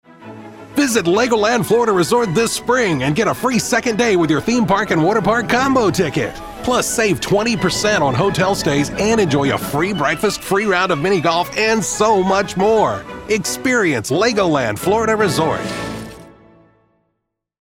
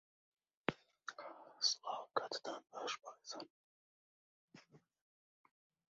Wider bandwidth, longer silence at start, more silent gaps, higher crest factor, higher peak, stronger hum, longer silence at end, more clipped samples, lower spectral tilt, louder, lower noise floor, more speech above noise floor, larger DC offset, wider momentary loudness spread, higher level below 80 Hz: first, 16.5 kHz vs 7.6 kHz; second, 0.2 s vs 0.7 s; second, none vs 3.50-4.48 s; second, 16 dB vs 34 dB; first, -2 dBFS vs -14 dBFS; neither; first, 1.4 s vs 1.15 s; neither; first, -4.5 dB/octave vs -0.5 dB/octave; first, -16 LUFS vs -43 LUFS; first, -74 dBFS vs -66 dBFS; first, 58 dB vs 22 dB; neither; second, 5 LU vs 16 LU; first, -44 dBFS vs -86 dBFS